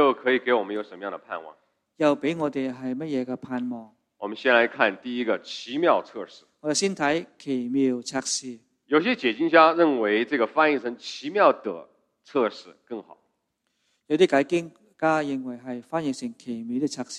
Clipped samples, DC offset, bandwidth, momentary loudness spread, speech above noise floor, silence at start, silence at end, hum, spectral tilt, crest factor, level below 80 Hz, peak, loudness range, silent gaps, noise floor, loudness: under 0.1%; under 0.1%; 11.5 kHz; 16 LU; 51 dB; 0 s; 0 s; none; -4 dB/octave; 22 dB; -74 dBFS; -2 dBFS; 6 LU; none; -76 dBFS; -24 LUFS